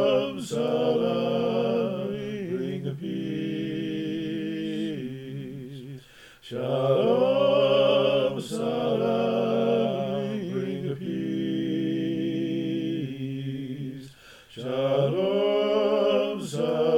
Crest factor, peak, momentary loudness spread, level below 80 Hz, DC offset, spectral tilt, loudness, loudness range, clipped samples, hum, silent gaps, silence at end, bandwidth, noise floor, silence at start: 16 dB; -10 dBFS; 14 LU; -66 dBFS; under 0.1%; -6.5 dB/octave; -26 LUFS; 8 LU; under 0.1%; none; none; 0 s; 15.5 kHz; -50 dBFS; 0 s